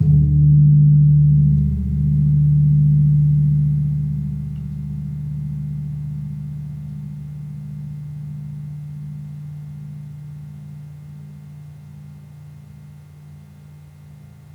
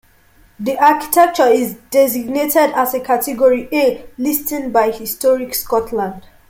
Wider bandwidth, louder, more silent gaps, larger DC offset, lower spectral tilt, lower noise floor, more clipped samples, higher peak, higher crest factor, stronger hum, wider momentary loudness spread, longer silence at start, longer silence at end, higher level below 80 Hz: second, 0.9 kHz vs 17 kHz; about the same, -17 LUFS vs -15 LUFS; neither; neither; first, -12 dB/octave vs -3.5 dB/octave; second, -41 dBFS vs -50 dBFS; neither; second, -6 dBFS vs 0 dBFS; about the same, 14 dB vs 14 dB; neither; first, 25 LU vs 7 LU; second, 0 s vs 0.6 s; about the same, 0.35 s vs 0.3 s; first, -34 dBFS vs -50 dBFS